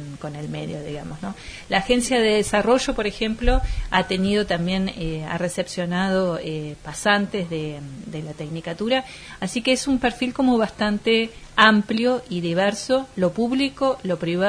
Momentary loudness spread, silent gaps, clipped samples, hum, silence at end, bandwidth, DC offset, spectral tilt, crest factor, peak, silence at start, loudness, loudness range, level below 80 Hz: 13 LU; none; under 0.1%; none; 0 s; 11 kHz; under 0.1%; -4.5 dB/octave; 22 dB; 0 dBFS; 0 s; -22 LUFS; 5 LU; -36 dBFS